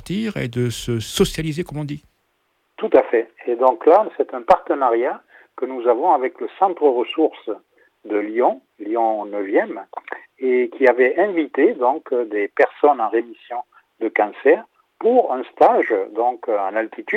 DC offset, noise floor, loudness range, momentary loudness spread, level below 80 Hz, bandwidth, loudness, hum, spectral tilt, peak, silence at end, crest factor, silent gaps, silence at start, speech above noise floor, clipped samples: under 0.1%; -67 dBFS; 4 LU; 13 LU; -50 dBFS; 15.5 kHz; -19 LUFS; none; -6 dB/octave; -2 dBFS; 0 s; 18 dB; none; 0.05 s; 49 dB; under 0.1%